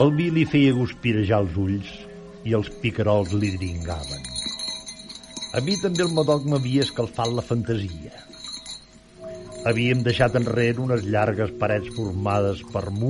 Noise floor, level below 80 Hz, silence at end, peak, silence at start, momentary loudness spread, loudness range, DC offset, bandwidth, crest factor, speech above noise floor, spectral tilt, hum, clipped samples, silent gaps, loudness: -45 dBFS; -46 dBFS; 0 s; -6 dBFS; 0 s; 16 LU; 4 LU; under 0.1%; 11.5 kHz; 18 dB; 23 dB; -6 dB/octave; none; under 0.1%; none; -23 LUFS